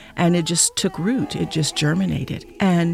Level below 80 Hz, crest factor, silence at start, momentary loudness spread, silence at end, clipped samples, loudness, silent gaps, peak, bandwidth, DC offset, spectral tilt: -46 dBFS; 16 dB; 0 s; 6 LU; 0 s; under 0.1%; -20 LUFS; none; -4 dBFS; 15 kHz; under 0.1%; -4.5 dB/octave